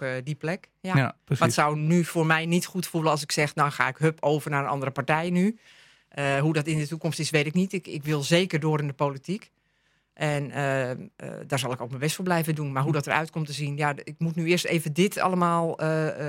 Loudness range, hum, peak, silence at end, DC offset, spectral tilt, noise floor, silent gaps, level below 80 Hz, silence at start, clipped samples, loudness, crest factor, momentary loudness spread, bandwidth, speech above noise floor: 5 LU; none; -6 dBFS; 0 s; under 0.1%; -5.5 dB/octave; -69 dBFS; none; -68 dBFS; 0 s; under 0.1%; -26 LUFS; 20 dB; 8 LU; 16.5 kHz; 43 dB